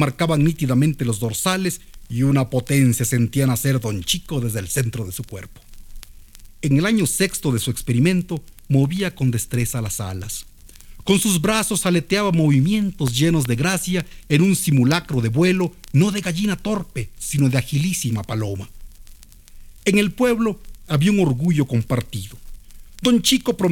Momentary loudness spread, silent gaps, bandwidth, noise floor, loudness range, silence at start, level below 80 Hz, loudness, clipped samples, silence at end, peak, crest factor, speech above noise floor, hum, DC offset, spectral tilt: 11 LU; none; 18.5 kHz; -43 dBFS; 4 LU; 0 s; -42 dBFS; -20 LUFS; under 0.1%; 0 s; -2 dBFS; 18 dB; 23 dB; none; under 0.1%; -5 dB/octave